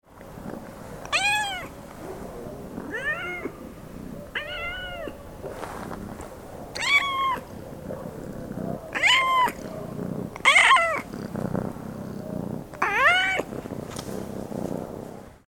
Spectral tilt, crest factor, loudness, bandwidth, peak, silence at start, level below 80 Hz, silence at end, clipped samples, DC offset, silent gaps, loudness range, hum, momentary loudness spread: -3 dB/octave; 24 dB; -24 LUFS; 19 kHz; -4 dBFS; 0.1 s; -50 dBFS; 0.1 s; under 0.1%; under 0.1%; none; 12 LU; none; 21 LU